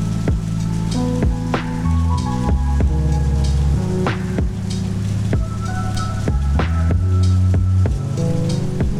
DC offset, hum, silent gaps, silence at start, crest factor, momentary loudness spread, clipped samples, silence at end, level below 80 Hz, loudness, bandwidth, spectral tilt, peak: under 0.1%; none; none; 0 s; 10 dB; 5 LU; under 0.1%; 0 s; -22 dBFS; -19 LUFS; 12 kHz; -7 dB/octave; -6 dBFS